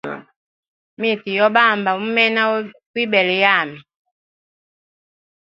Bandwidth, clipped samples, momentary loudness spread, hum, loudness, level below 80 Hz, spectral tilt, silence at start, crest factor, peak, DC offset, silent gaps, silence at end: 7.4 kHz; under 0.1%; 14 LU; none; -16 LUFS; -68 dBFS; -6 dB/octave; 0.05 s; 20 dB; 0 dBFS; under 0.1%; 0.36-0.97 s, 2.86-2.94 s; 1.6 s